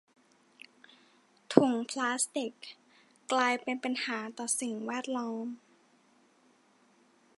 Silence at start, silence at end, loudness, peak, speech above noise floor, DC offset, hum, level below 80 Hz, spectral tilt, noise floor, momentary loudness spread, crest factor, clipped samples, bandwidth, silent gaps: 1.5 s; 1.8 s; -32 LUFS; -4 dBFS; 35 dB; under 0.1%; none; -86 dBFS; -3 dB/octave; -66 dBFS; 22 LU; 32 dB; under 0.1%; 11.5 kHz; none